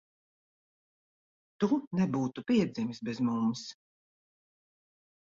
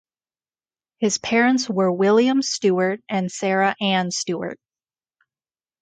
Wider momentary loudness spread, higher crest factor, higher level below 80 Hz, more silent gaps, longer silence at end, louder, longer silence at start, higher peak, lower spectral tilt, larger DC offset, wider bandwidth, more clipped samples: about the same, 7 LU vs 8 LU; about the same, 18 dB vs 16 dB; about the same, -70 dBFS vs -66 dBFS; first, 1.87-1.91 s vs none; first, 1.65 s vs 1.25 s; second, -31 LUFS vs -20 LUFS; first, 1.6 s vs 1 s; second, -16 dBFS vs -6 dBFS; first, -6.5 dB/octave vs -4 dB/octave; neither; second, 7.6 kHz vs 9.4 kHz; neither